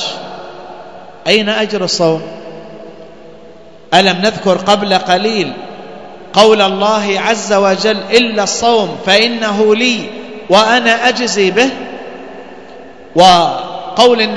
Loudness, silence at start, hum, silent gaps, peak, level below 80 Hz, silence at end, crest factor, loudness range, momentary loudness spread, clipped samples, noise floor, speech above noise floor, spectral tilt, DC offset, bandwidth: -11 LUFS; 0 s; none; none; 0 dBFS; -50 dBFS; 0 s; 12 dB; 4 LU; 21 LU; 0.6%; -37 dBFS; 27 dB; -3.5 dB/octave; 1%; 11 kHz